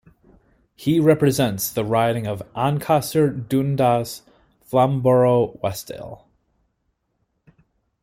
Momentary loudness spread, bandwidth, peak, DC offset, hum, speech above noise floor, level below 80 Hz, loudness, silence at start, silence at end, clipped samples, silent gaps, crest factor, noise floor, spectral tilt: 14 LU; 16.5 kHz; -4 dBFS; under 0.1%; none; 52 dB; -54 dBFS; -20 LUFS; 0.8 s; 1.9 s; under 0.1%; none; 18 dB; -72 dBFS; -6.5 dB/octave